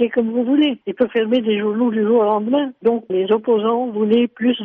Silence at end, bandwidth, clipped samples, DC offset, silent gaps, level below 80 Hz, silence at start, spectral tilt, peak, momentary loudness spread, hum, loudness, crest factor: 0 s; 3.9 kHz; under 0.1%; under 0.1%; none; -64 dBFS; 0 s; -4.5 dB/octave; -6 dBFS; 4 LU; none; -18 LUFS; 12 dB